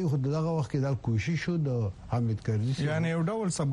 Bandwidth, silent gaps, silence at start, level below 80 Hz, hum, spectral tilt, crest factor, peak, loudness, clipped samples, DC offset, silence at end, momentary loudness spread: 11 kHz; none; 0 s; -54 dBFS; none; -7 dB/octave; 12 dB; -16 dBFS; -30 LUFS; under 0.1%; under 0.1%; 0 s; 2 LU